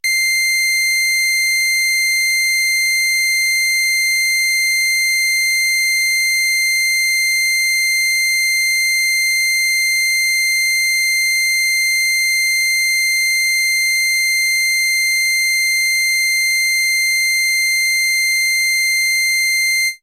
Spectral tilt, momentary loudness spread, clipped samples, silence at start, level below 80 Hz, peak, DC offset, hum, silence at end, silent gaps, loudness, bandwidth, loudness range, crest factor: 7 dB/octave; 0 LU; under 0.1%; 0.05 s; -74 dBFS; -10 dBFS; under 0.1%; none; 0.05 s; none; -13 LUFS; 16 kHz; 0 LU; 6 dB